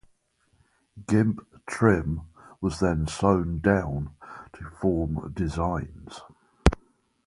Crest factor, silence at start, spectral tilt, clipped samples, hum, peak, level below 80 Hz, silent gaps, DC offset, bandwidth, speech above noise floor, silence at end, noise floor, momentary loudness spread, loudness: 26 dB; 0.95 s; -7 dB/octave; under 0.1%; none; 0 dBFS; -38 dBFS; none; under 0.1%; 11.5 kHz; 43 dB; 0.5 s; -68 dBFS; 20 LU; -26 LUFS